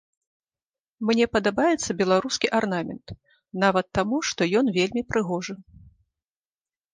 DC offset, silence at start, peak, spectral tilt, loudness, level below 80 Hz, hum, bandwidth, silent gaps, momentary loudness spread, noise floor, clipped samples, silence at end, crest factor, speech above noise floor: under 0.1%; 1 s; -6 dBFS; -4.5 dB/octave; -24 LUFS; -54 dBFS; none; 10 kHz; none; 14 LU; under -90 dBFS; under 0.1%; 1.35 s; 20 dB; over 66 dB